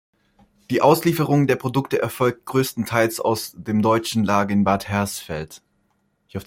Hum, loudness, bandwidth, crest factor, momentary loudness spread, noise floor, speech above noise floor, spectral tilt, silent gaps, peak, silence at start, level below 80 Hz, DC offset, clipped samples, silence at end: none; -21 LUFS; 16.5 kHz; 18 dB; 9 LU; -67 dBFS; 47 dB; -5.5 dB/octave; none; -2 dBFS; 0.7 s; -56 dBFS; under 0.1%; under 0.1%; 0.05 s